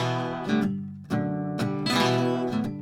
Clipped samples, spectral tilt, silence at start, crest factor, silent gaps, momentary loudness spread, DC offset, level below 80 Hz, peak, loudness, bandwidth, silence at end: under 0.1%; -6 dB/octave; 0 s; 18 dB; none; 7 LU; under 0.1%; -58 dBFS; -8 dBFS; -27 LUFS; 17.5 kHz; 0 s